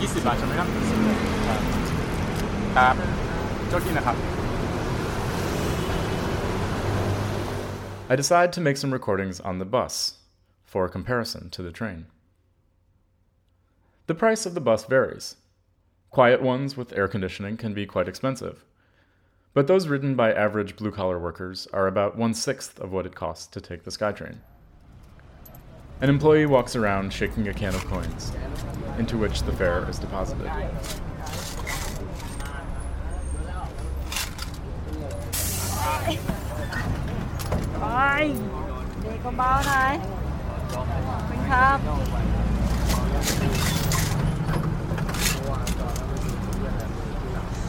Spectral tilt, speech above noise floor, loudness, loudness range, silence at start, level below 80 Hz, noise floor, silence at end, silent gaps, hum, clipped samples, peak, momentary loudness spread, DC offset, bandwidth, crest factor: -5 dB/octave; 41 dB; -26 LUFS; 8 LU; 0 s; -34 dBFS; -65 dBFS; 0 s; none; none; under 0.1%; -4 dBFS; 13 LU; under 0.1%; 17.5 kHz; 20 dB